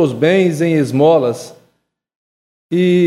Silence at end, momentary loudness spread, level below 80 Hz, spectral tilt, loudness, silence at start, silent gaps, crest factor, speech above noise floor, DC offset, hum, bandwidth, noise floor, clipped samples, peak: 0 s; 9 LU; -62 dBFS; -7 dB/octave; -14 LUFS; 0 s; 2.16-2.69 s; 14 dB; 52 dB; under 0.1%; none; 13.5 kHz; -64 dBFS; under 0.1%; 0 dBFS